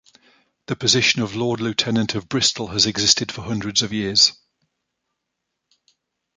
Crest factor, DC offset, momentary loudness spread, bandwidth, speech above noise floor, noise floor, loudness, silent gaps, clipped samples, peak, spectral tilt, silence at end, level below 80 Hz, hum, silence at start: 22 dB; under 0.1%; 8 LU; 10 kHz; 59 dB; -79 dBFS; -18 LUFS; none; under 0.1%; 0 dBFS; -2.5 dB/octave; 2.05 s; -54 dBFS; none; 0.7 s